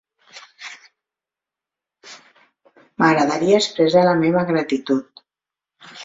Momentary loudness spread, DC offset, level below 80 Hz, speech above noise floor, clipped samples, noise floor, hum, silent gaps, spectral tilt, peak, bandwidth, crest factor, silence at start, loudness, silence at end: 21 LU; under 0.1%; -64 dBFS; 72 dB; under 0.1%; -88 dBFS; none; none; -5.5 dB/octave; -2 dBFS; 7.8 kHz; 20 dB; 0.35 s; -17 LUFS; 0 s